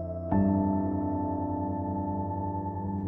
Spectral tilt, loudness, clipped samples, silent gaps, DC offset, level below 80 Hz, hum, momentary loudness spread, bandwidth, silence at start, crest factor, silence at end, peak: -13.5 dB/octave; -30 LUFS; under 0.1%; none; under 0.1%; -48 dBFS; none; 7 LU; 2.3 kHz; 0 s; 16 dB; 0 s; -12 dBFS